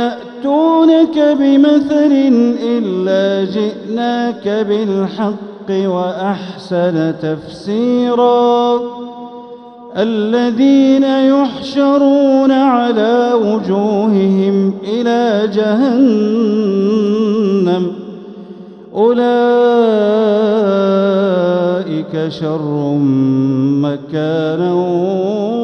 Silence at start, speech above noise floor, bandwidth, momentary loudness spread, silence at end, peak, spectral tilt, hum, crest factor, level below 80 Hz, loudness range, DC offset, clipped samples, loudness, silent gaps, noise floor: 0 s; 21 dB; 6.6 kHz; 10 LU; 0 s; 0 dBFS; -7.5 dB/octave; none; 12 dB; -60 dBFS; 5 LU; under 0.1%; under 0.1%; -13 LUFS; none; -33 dBFS